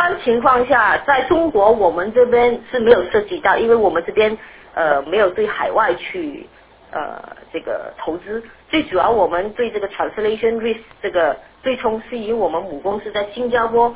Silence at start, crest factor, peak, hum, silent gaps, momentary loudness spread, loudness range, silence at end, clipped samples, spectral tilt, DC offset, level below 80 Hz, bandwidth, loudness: 0 s; 18 dB; 0 dBFS; none; none; 13 LU; 7 LU; 0 s; under 0.1%; -8.5 dB/octave; under 0.1%; -48 dBFS; 4 kHz; -17 LUFS